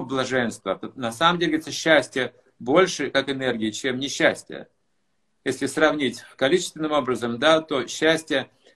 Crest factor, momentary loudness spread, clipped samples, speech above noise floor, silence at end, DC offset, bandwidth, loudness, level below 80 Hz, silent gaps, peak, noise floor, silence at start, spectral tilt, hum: 22 dB; 11 LU; under 0.1%; 52 dB; 0.3 s; under 0.1%; 12.5 kHz; -23 LUFS; -60 dBFS; none; -2 dBFS; -74 dBFS; 0 s; -3.5 dB/octave; none